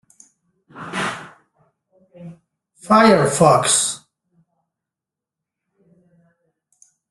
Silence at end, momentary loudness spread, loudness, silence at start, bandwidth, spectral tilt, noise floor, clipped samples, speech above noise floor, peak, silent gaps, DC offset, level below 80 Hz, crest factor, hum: 3.15 s; 24 LU; -16 LUFS; 0.75 s; 12.5 kHz; -3.5 dB/octave; -87 dBFS; under 0.1%; 73 dB; -2 dBFS; none; under 0.1%; -60 dBFS; 20 dB; none